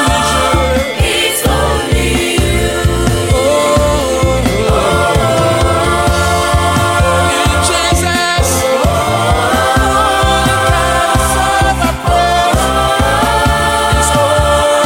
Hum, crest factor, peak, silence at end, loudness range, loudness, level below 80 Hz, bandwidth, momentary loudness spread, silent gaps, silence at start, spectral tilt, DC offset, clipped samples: none; 10 dB; 0 dBFS; 0 s; 1 LU; -11 LUFS; -20 dBFS; 17 kHz; 2 LU; none; 0 s; -4 dB/octave; 0.2%; under 0.1%